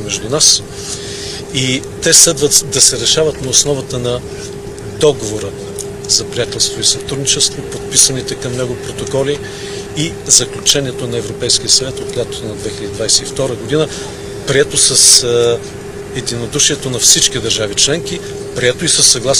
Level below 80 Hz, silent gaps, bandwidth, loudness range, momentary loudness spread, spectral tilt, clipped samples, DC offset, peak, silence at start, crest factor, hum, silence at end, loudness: -38 dBFS; none; over 20 kHz; 5 LU; 16 LU; -2 dB/octave; 0.3%; under 0.1%; 0 dBFS; 0 s; 14 dB; none; 0 s; -12 LUFS